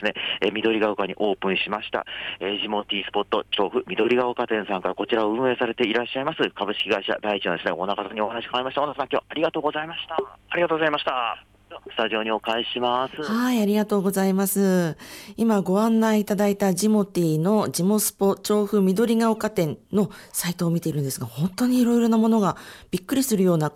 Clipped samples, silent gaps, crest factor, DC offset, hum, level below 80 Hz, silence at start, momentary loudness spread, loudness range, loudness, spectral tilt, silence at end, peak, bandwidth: under 0.1%; none; 14 dB; under 0.1%; none; -60 dBFS; 0 s; 7 LU; 4 LU; -23 LUFS; -5 dB/octave; 0.05 s; -10 dBFS; 16.5 kHz